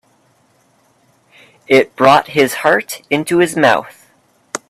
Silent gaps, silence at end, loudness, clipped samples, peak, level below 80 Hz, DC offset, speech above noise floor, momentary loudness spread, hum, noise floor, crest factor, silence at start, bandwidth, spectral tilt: none; 0.15 s; -13 LUFS; under 0.1%; 0 dBFS; -58 dBFS; under 0.1%; 43 dB; 8 LU; none; -56 dBFS; 16 dB; 1.7 s; 15.5 kHz; -4 dB/octave